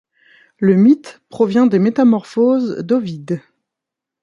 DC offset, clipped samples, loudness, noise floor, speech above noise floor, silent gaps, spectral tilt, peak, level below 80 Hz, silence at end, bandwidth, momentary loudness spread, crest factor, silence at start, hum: under 0.1%; under 0.1%; -15 LUFS; -83 dBFS; 69 dB; none; -8.5 dB/octave; -2 dBFS; -62 dBFS; 0.85 s; 7.4 kHz; 13 LU; 14 dB; 0.6 s; none